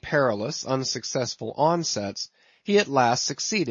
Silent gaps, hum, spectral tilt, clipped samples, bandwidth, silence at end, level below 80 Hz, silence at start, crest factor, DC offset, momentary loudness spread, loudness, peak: none; none; -3.5 dB/octave; under 0.1%; 7.6 kHz; 0 s; -62 dBFS; 0 s; 18 dB; under 0.1%; 10 LU; -25 LUFS; -6 dBFS